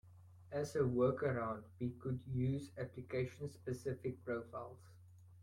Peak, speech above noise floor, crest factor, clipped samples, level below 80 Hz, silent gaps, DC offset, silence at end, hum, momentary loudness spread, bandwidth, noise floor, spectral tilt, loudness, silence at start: -22 dBFS; 20 dB; 18 dB; under 0.1%; -68 dBFS; none; under 0.1%; 0 s; none; 12 LU; 12.5 kHz; -61 dBFS; -8 dB/octave; -41 LUFS; 0.05 s